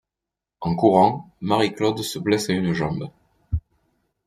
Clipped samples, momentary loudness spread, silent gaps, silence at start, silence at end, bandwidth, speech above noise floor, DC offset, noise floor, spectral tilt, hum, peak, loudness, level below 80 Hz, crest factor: under 0.1%; 13 LU; none; 0.6 s; 0.65 s; 15.5 kHz; 66 dB; under 0.1%; -87 dBFS; -6 dB/octave; none; -2 dBFS; -22 LUFS; -44 dBFS; 22 dB